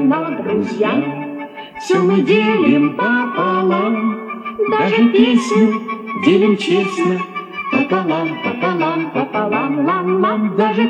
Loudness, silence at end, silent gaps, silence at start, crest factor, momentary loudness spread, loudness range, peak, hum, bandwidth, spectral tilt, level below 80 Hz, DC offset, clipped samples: -16 LUFS; 0 s; none; 0 s; 14 dB; 10 LU; 3 LU; 0 dBFS; none; 9.6 kHz; -6.5 dB/octave; -64 dBFS; under 0.1%; under 0.1%